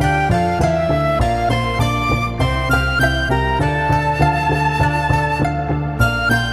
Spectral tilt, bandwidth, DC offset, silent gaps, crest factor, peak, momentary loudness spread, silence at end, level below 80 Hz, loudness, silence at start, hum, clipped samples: -6 dB/octave; 15.5 kHz; under 0.1%; none; 16 dB; -2 dBFS; 3 LU; 0 s; -26 dBFS; -17 LUFS; 0 s; none; under 0.1%